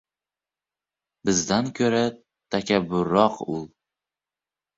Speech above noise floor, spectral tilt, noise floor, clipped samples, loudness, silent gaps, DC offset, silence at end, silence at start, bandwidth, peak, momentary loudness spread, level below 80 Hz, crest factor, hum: over 67 dB; -4.5 dB/octave; under -90 dBFS; under 0.1%; -24 LUFS; none; under 0.1%; 1.1 s; 1.25 s; 8 kHz; -4 dBFS; 11 LU; -58 dBFS; 22 dB; 50 Hz at -45 dBFS